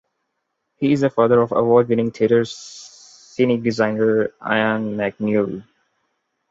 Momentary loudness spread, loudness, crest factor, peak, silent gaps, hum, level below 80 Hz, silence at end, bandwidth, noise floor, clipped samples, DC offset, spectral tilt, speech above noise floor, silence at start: 14 LU; -19 LUFS; 18 dB; -2 dBFS; none; none; -60 dBFS; 0.9 s; 7.8 kHz; -75 dBFS; under 0.1%; under 0.1%; -6.5 dB/octave; 57 dB; 0.8 s